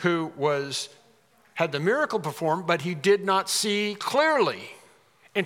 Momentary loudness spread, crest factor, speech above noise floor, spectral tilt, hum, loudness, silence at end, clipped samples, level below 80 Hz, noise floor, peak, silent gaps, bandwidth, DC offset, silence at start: 10 LU; 20 dB; 36 dB; -4 dB/octave; none; -25 LUFS; 0 s; under 0.1%; -80 dBFS; -60 dBFS; -6 dBFS; none; 16.5 kHz; under 0.1%; 0 s